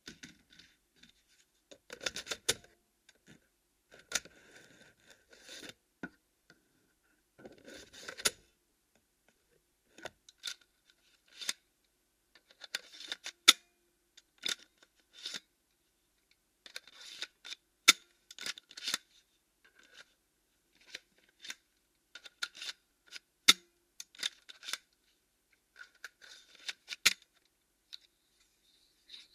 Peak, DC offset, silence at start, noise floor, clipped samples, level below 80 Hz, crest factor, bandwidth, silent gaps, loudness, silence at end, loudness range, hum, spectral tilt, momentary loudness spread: -4 dBFS; under 0.1%; 0.05 s; -77 dBFS; under 0.1%; -76 dBFS; 38 dB; 15.5 kHz; none; -33 LUFS; 0.15 s; 15 LU; none; 1.5 dB/octave; 27 LU